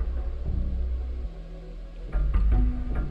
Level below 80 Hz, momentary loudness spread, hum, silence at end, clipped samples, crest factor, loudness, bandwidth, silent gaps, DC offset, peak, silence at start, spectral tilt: -26 dBFS; 17 LU; none; 0 s; under 0.1%; 12 dB; -30 LUFS; 4.3 kHz; none; under 0.1%; -14 dBFS; 0 s; -9.5 dB/octave